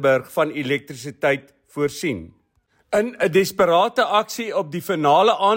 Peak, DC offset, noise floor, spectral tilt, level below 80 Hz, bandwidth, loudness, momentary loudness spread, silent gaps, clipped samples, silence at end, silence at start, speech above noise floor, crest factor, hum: -4 dBFS; under 0.1%; -65 dBFS; -4.5 dB/octave; -60 dBFS; 16.5 kHz; -20 LUFS; 10 LU; none; under 0.1%; 0 s; 0 s; 45 dB; 16 dB; none